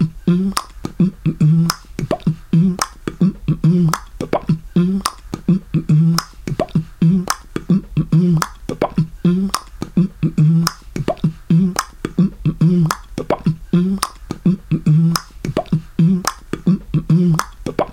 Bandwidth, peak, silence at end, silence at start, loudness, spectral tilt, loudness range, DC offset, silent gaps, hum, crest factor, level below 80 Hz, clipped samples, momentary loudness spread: 17 kHz; 0 dBFS; 0 s; 0 s; -18 LUFS; -6.5 dB/octave; 1 LU; under 0.1%; none; none; 16 dB; -38 dBFS; under 0.1%; 9 LU